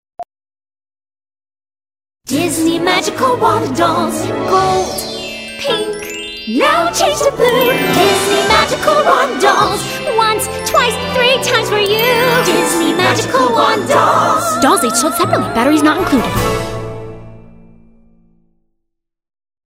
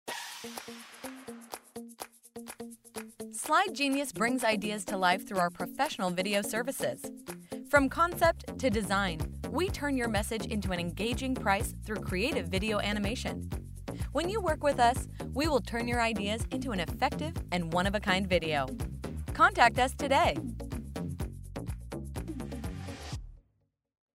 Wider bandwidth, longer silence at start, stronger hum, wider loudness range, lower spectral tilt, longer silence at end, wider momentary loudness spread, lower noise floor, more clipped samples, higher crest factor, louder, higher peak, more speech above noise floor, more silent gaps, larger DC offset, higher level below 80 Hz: about the same, 16.5 kHz vs 16 kHz; first, 0.2 s vs 0.05 s; neither; about the same, 5 LU vs 6 LU; about the same, -3.5 dB/octave vs -4.5 dB/octave; first, 2.2 s vs 0.8 s; second, 10 LU vs 17 LU; about the same, -72 dBFS vs -75 dBFS; neither; second, 14 dB vs 24 dB; first, -13 LUFS vs -31 LUFS; first, 0 dBFS vs -8 dBFS; first, 60 dB vs 45 dB; neither; neither; about the same, -40 dBFS vs -44 dBFS